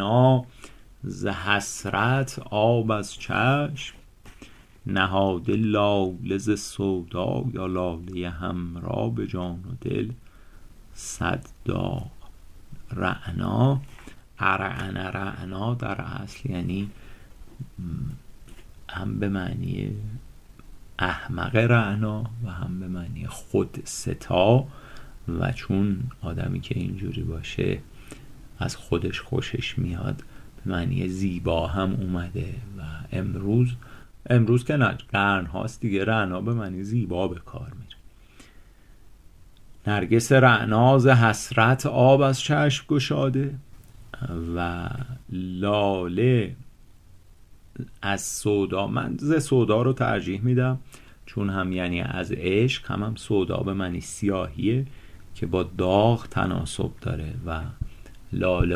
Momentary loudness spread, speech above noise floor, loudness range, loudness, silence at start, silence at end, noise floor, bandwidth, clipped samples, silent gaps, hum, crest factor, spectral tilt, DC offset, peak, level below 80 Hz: 15 LU; 25 dB; 10 LU; -25 LUFS; 0 s; 0 s; -50 dBFS; 14.5 kHz; under 0.1%; none; none; 22 dB; -6 dB/octave; under 0.1%; -4 dBFS; -42 dBFS